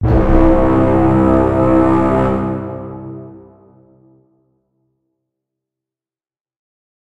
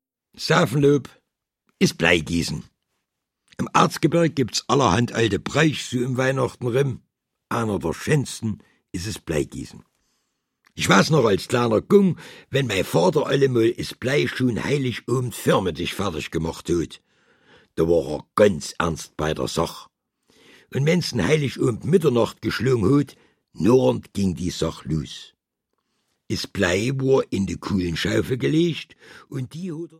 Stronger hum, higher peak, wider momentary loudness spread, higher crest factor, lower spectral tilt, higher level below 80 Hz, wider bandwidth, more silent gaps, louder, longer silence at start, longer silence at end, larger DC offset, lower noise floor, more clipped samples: neither; about the same, 0 dBFS vs -2 dBFS; first, 17 LU vs 13 LU; second, 16 dB vs 22 dB; first, -10 dB/octave vs -5.5 dB/octave; first, -24 dBFS vs -48 dBFS; second, 8 kHz vs 16.5 kHz; neither; first, -13 LUFS vs -22 LUFS; second, 0 s vs 0.35 s; first, 3.65 s vs 0.1 s; neither; first, under -90 dBFS vs -79 dBFS; neither